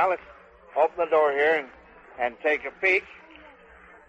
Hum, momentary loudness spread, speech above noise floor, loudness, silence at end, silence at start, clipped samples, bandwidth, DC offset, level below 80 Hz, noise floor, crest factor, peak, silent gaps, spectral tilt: none; 11 LU; 27 dB; -24 LUFS; 0.95 s; 0 s; under 0.1%; 8.4 kHz; under 0.1%; -62 dBFS; -51 dBFS; 16 dB; -10 dBFS; none; -4.5 dB/octave